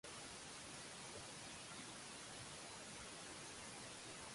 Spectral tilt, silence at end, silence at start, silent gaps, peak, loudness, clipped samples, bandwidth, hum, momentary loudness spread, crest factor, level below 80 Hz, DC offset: -2 dB/octave; 0 s; 0.05 s; none; -40 dBFS; -52 LUFS; under 0.1%; 11.5 kHz; none; 0 LU; 14 dB; -74 dBFS; under 0.1%